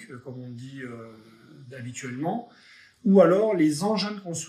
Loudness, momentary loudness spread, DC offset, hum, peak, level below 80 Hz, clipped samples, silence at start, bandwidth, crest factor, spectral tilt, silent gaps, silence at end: -23 LUFS; 22 LU; under 0.1%; none; -6 dBFS; -76 dBFS; under 0.1%; 0 s; 13 kHz; 20 dB; -6 dB/octave; none; 0 s